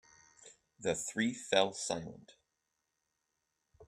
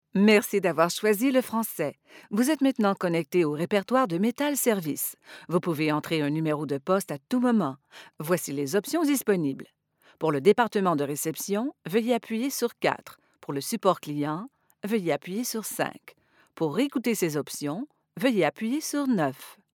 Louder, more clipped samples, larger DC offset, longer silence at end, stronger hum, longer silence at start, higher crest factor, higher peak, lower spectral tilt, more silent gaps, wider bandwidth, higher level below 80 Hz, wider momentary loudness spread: second, -35 LUFS vs -27 LUFS; neither; neither; second, 0.05 s vs 0.2 s; neither; first, 0.45 s vs 0.15 s; first, 28 dB vs 20 dB; second, -12 dBFS vs -6 dBFS; second, -3 dB/octave vs -5 dB/octave; neither; second, 15.5 kHz vs over 20 kHz; about the same, -74 dBFS vs -78 dBFS; about the same, 10 LU vs 9 LU